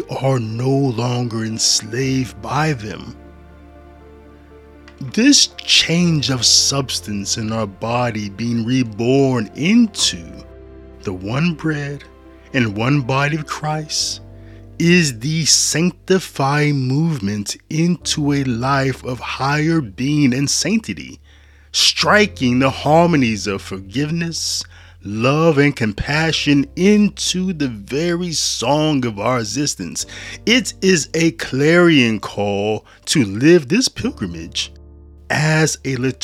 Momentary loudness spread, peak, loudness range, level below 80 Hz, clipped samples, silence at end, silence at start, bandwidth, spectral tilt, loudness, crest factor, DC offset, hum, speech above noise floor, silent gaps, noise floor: 12 LU; 0 dBFS; 5 LU; -44 dBFS; under 0.1%; 0.05 s; 0 s; 15.5 kHz; -4 dB/octave; -17 LUFS; 18 dB; under 0.1%; none; 29 dB; none; -46 dBFS